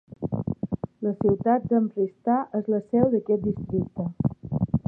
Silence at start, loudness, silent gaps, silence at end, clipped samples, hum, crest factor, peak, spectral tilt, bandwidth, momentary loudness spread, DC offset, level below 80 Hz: 0.1 s; -26 LUFS; none; 0.1 s; under 0.1%; none; 18 dB; -6 dBFS; -13.5 dB/octave; 2.5 kHz; 8 LU; under 0.1%; -50 dBFS